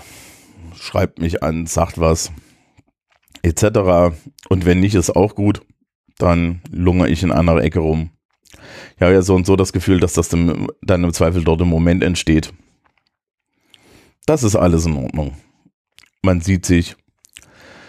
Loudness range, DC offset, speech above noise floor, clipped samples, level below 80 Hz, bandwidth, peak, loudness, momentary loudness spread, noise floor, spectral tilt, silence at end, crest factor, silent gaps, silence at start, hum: 5 LU; under 0.1%; 48 dB; under 0.1%; -32 dBFS; 14.5 kHz; 0 dBFS; -16 LUFS; 10 LU; -63 dBFS; -6 dB/octave; 0.95 s; 16 dB; 5.95-6.04 s, 8.25-8.29 s, 15.74-15.85 s; 0.6 s; none